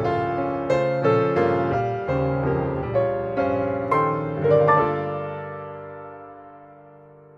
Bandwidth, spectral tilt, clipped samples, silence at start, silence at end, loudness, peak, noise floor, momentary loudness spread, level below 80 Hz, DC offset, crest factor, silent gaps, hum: 7.8 kHz; -8.5 dB/octave; under 0.1%; 0 s; 0.4 s; -22 LUFS; -6 dBFS; -47 dBFS; 17 LU; -48 dBFS; under 0.1%; 18 dB; none; none